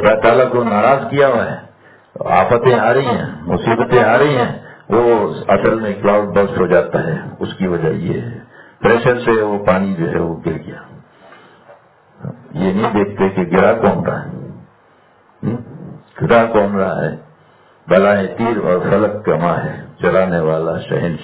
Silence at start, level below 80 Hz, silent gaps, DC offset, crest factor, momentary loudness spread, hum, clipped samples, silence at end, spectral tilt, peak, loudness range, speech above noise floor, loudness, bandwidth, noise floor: 0 s; -44 dBFS; none; under 0.1%; 16 dB; 15 LU; none; under 0.1%; 0 s; -11 dB/octave; 0 dBFS; 5 LU; 36 dB; -15 LUFS; 4 kHz; -50 dBFS